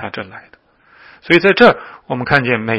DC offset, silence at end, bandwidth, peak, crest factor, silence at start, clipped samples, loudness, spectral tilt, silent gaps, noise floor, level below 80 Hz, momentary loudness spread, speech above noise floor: under 0.1%; 0 s; 11 kHz; 0 dBFS; 16 dB; 0 s; 0.2%; -12 LUFS; -7 dB/octave; none; -47 dBFS; -48 dBFS; 18 LU; 33 dB